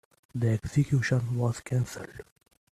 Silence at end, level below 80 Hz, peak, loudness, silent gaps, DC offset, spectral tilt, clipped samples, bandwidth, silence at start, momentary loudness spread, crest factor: 0.5 s; -54 dBFS; -12 dBFS; -28 LUFS; none; under 0.1%; -7 dB/octave; under 0.1%; 13.5 kHz; 0.35 s; 16 LU; 16 dB